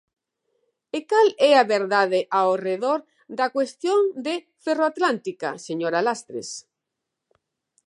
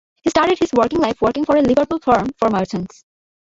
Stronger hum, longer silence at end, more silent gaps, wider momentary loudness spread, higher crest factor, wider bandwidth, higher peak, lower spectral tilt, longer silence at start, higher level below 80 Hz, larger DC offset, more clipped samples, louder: neither; first, 1.3 s vs 0.55 s; neither; first, 15 LU vs 7 LU; about the same, 20 dB vs 16 dB; first, 11 kHz vs 8 kHz; about the same, -2 dBFS vs -2 dBFS; second, -4 dB/octave vs -5.5 dB/octave; first, 0.95 s vs 0.25 s; second, -82 dBFS vs -46 dBFS; neither; neither; second, -22 LUFS vs -17 LUFS